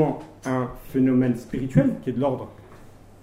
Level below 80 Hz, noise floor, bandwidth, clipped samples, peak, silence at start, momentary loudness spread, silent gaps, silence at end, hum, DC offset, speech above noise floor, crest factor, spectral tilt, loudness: -46 dBFS; -46 dBFS; 15 kHz; under 0.1%; -4 dBFS; 0 s; 11 LU; none; 0.35 s; none; under 0.1%; 24 dB; 20 dB; -8.5 dB/octave; -24 LUFS